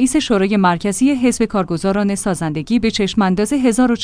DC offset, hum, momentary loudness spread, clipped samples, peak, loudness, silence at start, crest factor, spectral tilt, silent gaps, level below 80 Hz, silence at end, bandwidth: under 0.1%; none; 4 LU; under 0.1%; -2 dBFS; -16 LUFS; 0 s; 14 dB; -5 dB/octave; none; -40 dBFS; 0 s; 10.5 kHz